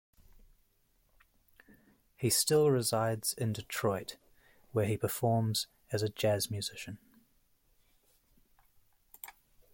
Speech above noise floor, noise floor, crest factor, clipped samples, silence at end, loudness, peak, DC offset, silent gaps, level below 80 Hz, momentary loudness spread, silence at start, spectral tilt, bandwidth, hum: 40 dB; -72 dBFS; 20 dB; under 0.1%; 0.45 s; -32 LUFS; -16 dBFS; under 0.1%; none; -66 dBFS; 20 LU; 2.2 s; -4.5 dB/octave; 17 kHz; none